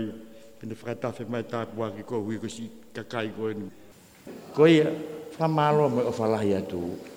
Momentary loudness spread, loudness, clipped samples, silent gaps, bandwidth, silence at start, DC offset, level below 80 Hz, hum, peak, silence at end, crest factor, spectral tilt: 19 LU; -27 LUFS; under 0.1%; none; 16.5 kHz; 0 s; under 0.1%; -64 dBFS; none; -6 dBFS; 0 s; 20 dB; -7 dB/octave